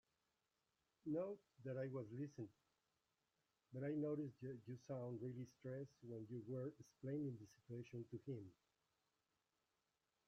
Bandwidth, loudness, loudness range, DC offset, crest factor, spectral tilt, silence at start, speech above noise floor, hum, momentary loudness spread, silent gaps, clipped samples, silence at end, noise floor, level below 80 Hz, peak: 8 kHz; -51 LUFS; 3 LU; under 0.1%; 16 dB; -9.5 dB/octave; 1.05 s; over 40 dB; none; 10 LU; none; under 0.1%; 1.75 s; under -90 dBFS; -88 dBFS; -36 dBFS